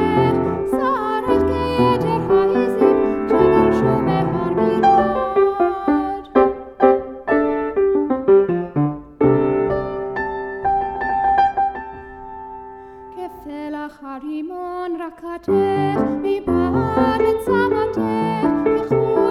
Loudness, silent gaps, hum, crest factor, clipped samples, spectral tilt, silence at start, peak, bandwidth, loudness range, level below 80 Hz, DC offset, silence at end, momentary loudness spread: -18 LUFS; none; none; 18 dB; under 0.1%; -8.5 dB/octave; 0 s; 0 dBFS; 12 kHz; 8 LU; -44 dBFS; under 0.1%; 0 s; 15 LU